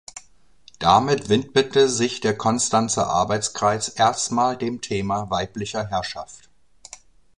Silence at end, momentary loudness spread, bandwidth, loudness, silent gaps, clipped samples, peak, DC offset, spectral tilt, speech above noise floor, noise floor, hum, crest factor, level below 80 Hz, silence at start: 1 s; 10 LU; 11 kHz; -21 LUFS; none; under 0.1%; -2 dBFS; 0.2%; -4 dB/octave; 35 dB; -56 dBFS; none; 20 dB; -50 dBFS; 0.15 s